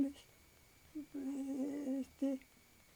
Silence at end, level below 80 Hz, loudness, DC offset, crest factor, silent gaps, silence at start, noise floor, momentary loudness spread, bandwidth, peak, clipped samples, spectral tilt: 0.5 s; -74 dBFS; -43 LUFS; under 0.1%; 16 dB; none; 0 s; -66 dBFS; 18 LU; over 20 kHz; -26 dBFS; under 0.1%; -5.5 dB/octave